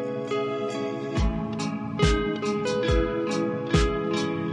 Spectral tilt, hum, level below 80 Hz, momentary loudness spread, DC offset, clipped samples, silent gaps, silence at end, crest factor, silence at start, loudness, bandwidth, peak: -6 dB/octave; none; -34 dBFS; 6 LU; under 0.1%; under 0.1%; none; 0 s; 16 dB; 0 s; -26 LUFS; 11 kHz; -8 dBFS